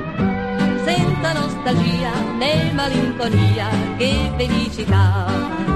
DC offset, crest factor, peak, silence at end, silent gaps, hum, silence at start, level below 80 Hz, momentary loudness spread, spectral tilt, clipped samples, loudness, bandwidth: under 0.1%; 14 dB; -4 dBFS; 0 s; none; none; 0 s; -34 dBFS; 4 LU; -6.5 dB/octave; under 0.1%; -19 LUFS; 13 kHz